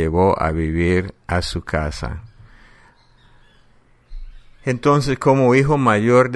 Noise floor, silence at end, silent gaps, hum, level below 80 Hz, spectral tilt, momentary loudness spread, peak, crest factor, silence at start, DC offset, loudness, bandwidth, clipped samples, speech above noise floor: -53 dBFS; 0 s; none; none; -34 dBFS; -7 dB/octave; 12 LU; 0 dBFS; 18 dB; 0 s; under 0.1%; -18 LUFS; 11.5 kHz; under 0.1%; 36 dB